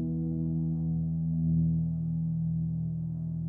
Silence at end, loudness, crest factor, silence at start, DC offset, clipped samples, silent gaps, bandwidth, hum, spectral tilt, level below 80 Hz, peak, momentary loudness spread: 0 s; -31 LUFS; 12 dB; 0 s; under 0.1%; under 0.1%; none; 1 kHz; none; -15.5 dB/octave; -50 dBFS; -18 dBFS; 6 LU